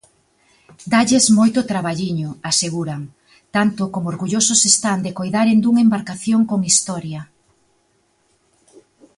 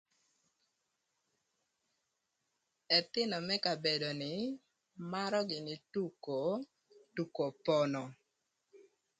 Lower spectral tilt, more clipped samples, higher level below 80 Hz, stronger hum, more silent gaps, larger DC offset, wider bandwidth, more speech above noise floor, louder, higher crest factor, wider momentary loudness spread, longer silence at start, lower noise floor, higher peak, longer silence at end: second, -3.5 dB/octave vs -5 dB/octave; neither; first, -58 dBFS vs -82 dBFS; neither; neither; neither; first, 11.5 kHz vs 9.4 kHz; about the same, 45 dB vs 48 dB; first, -17 LUFS vs -36 LUFS; about the same, 18 dB vs 22 dB; first, 14 LU vs 11 LU; second, 0.8 s vs 2.9 s; second, -62 dBFS vs -84 dBFS; first, 0 dBFS vs -16 dBFS; first, 1.95 s vs 0.35 s